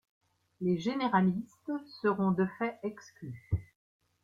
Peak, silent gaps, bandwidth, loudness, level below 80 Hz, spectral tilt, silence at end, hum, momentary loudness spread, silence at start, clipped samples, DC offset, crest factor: -14 dBFS; none; 7.2 kHz; -32 LUFS; -56 dBFS; -8 dB/octave; 0.6 s; none; 13 LU; 0.6 s; under 0.1%; under 0.1%; 18 dB